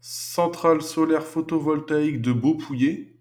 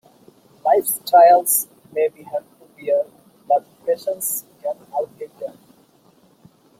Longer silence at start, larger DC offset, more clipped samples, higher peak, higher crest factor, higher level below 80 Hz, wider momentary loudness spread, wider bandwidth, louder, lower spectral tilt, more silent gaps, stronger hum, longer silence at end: second, 0.05 s vs 0.65 s; neither; neither; second, -6 dBFS vs -2 dBFS; about the same, 16 dB vs 18 dB; first, -64 dBFS vs -74 dBFS; second, 3 LU vs 20 LU; first, 19.5 kHz vs 16.5 kHz; second, -23 LUFS vs -19 LUFS; first, -6 dB/octave vs -2 dB/octave; neither; neither; second, 0.15 s vs 1.3 s